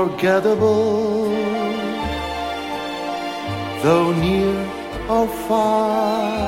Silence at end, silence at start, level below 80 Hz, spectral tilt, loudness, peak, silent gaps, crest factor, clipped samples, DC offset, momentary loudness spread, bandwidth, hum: 0 s; 0 s; -40 dBFS; -6 dB/octave; -20 LUFS; -4 dBFS; none; 16 dB; under 0.1%; under 0.1%; 9 LU; 16.5 kHz; none